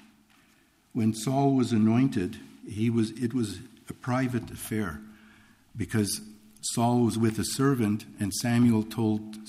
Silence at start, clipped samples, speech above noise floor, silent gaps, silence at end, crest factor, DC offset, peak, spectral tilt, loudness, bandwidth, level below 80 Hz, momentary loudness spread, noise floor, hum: 0.95 s; under 0.1%; 37 dB; none; 0 s; 16 dB; under 0.1%; -12 dBFS; -6 dB/octave; -27 LUFS; 15.5 kHz; -58 dBFS; 13 LU; -63 dBFS; none